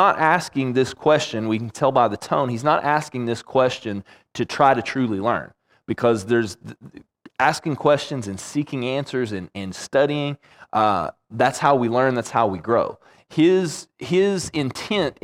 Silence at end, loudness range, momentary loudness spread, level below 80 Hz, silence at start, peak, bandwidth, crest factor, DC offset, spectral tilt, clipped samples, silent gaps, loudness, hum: 0.1 s; 3 LU; 12 LU; -60 dBFS; 0 s; -2 dBFS; 15 kHz; 18 dB; under 0.1%; -5.5 dB/octave; under 0.1%; none; -21 LUFS; none